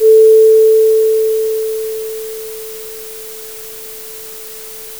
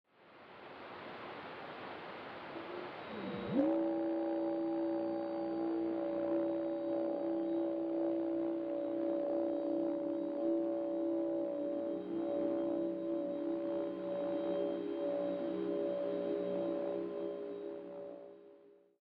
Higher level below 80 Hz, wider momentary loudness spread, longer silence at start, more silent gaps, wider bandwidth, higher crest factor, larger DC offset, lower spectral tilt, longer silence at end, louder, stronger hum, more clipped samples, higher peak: first, -60 dBFS vs -80 dBFS; first, 20 LU vs 11 LU; second, 0 s vs 0.2 s; neither; first, over 20 kHz vs 5 kHz; second, 12 dB vs 18 dB; first, 0.4% vs under 0.1%; second, -1.5 dB/octave vs -9 dB/octave; second, 0 s vs 0.35 s; first, -11 LUFS vs -38 LUFS; neither; neither; first, -2 dBFS vs -20 dBFS